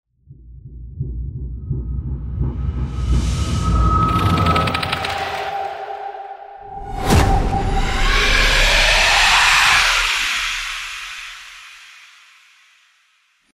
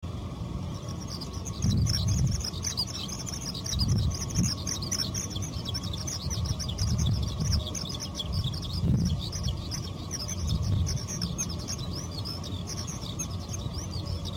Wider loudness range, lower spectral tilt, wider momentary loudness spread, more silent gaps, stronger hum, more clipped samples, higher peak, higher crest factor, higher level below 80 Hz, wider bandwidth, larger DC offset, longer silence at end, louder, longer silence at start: first, 11 LU vs 3 LU; about the same, -3.5 dB/octave vs -4.5 dB/octave; first, 21 LU vs 8 LU; neither; neither; neither; first, 0 dBFS vs -14 dBFS; about the same, 18 dB vs 16 dB; first, -24 dBFS vs -38 dBFS; about the same, 16 kHz vs 16.5 kHz; neither; first, 1.65 s vs 0 s; first, -17 LUFS vs -31 LUFS; first, 0.3 s vs 0 s